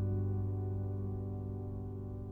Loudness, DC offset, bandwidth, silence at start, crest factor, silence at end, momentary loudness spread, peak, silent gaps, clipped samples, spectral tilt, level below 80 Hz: -39 LUFS; under 0.1%; 1.6 kHz; 0 s; 12 dB; 0 s; 7 LU; -26 dBFS; none; under 0.1%; -12.5 dB/octave; -50 dBFS